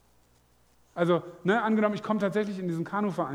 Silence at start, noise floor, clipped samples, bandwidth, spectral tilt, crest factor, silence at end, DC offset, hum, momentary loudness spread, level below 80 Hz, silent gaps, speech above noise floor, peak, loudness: 0.95 s; -64 dBFS; under 0.1%; 19 kHz; -7.5 dB/octave; 18 dB; 0 s; under 0.1%; 60 Hz at -50 dBFS; 6 LU; -70 dBFS; none; 37 dB; -10 dBFS; -28 LUFS